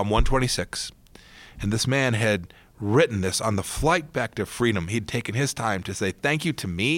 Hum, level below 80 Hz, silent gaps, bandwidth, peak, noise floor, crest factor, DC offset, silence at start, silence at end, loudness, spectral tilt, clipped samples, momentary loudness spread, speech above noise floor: none; -36 dBFS; none; 17 kHz; -8 dBFS; -49 dBFS; 18 dB; under 0.1%; 0 s; 0 s; -25 LUFS; -4.5 dB/octave; under 0.1%; 7 LU; 25 dB